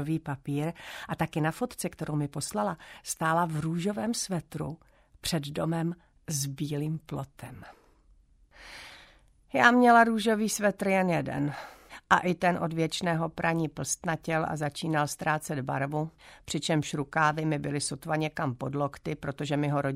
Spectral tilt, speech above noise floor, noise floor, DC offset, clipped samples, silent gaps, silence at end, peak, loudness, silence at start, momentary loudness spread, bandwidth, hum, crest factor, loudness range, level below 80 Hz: -5 dB/octave; 32 dB; -61 dBFS; under 0.1%; under 0.1%; none; 0 s; -6 dBFS; -29 LUFS; 0 s; 14 LU; 16 kHz; none; 24 dB; 9 LU; -60 dBFS